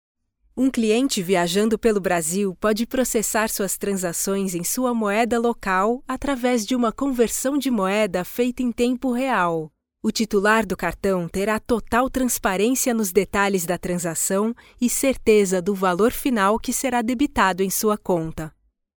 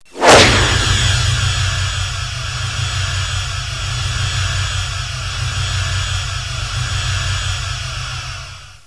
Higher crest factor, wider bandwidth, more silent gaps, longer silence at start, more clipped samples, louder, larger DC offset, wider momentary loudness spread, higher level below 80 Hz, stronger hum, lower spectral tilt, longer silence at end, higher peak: about the same, 16 dB vs 18 dB; first, over 20 kHz vs 11 kHz; neither; first, 0.55 s vs 0.15 s; neither; second, -21 LUFS vs -16 LUFS; second, under 0.1% vs 0.6%; second, 5 LU vs 11 LU; second, -44 dBFS vs -26 dBFS; neither; about the same, -4 dB/octave vs -3 dB/octave; first, 0.5 s vs 0.1 s; second, -4 dBFS vs 0 dBFS